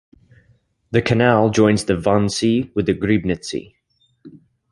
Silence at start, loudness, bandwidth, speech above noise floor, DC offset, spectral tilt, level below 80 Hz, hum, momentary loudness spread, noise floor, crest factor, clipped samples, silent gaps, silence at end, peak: 0.9 s; -18 LUFS; 11.5 kHz; 42 dB; under 0.1%; -6 dB/octave; -44 dBFS; none; 9 LU; -59 dBFS; 18 dB; under 0.1%; none; 0.35 s; -2 dBFS